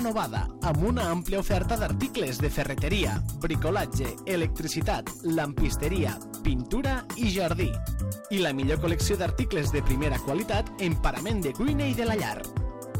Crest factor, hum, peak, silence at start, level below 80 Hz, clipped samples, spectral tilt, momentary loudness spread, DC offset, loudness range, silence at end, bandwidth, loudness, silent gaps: 16 dB; none; -12 dBFS; 0 s; -34 dBFS; under 0.1%; -5.5 dB/octave; 4 LU; under 0.1%; 1 LU; 0 s; 17 kHz; -28 LUFS; none